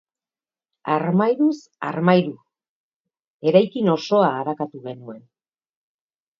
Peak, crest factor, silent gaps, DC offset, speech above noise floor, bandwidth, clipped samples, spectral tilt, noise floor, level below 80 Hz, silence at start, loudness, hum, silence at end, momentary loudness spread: -2 dBFS; 22 dB; 2.69-3.05 s, 3.27-3.40 s; under 0.1%; over 70 dB; 7.2 kHz; under 0.1%; -7.5 dB/octave; under -90 dBFS; -70 dBFS; 0.85 s; -20 LUFS; none; 1.2 s; 17 LU